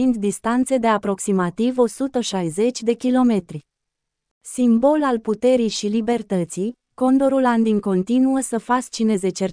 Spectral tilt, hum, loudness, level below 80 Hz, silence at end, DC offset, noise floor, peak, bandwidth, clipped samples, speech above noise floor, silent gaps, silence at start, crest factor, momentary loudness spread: -5.5 dB/octave; none; -20 LUFS; -56 dBFS; 0 s; under 0.1%; -80 dBFS; -4 dBFS; 10.5 kHz; under 0.1%; 61 dB; 4.31-4.41 s; 0 s; 14 dB; 6 LU